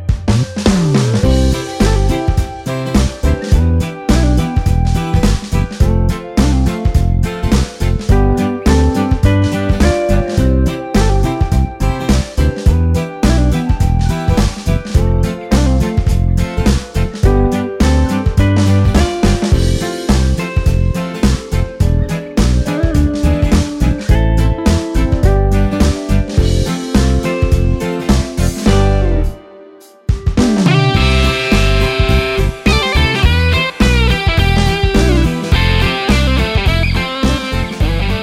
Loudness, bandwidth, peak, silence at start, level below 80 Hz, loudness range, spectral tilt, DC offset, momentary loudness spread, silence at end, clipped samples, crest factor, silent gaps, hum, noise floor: -14 LUFS; 15.5 kHz; 0 dBFS; 0 s; -16 dBFS; 2 LU; -6 dB/octave; under 0.1%; 4 LU; 0 s; under 0.1%; 12 dB; none; none; -39 dBFS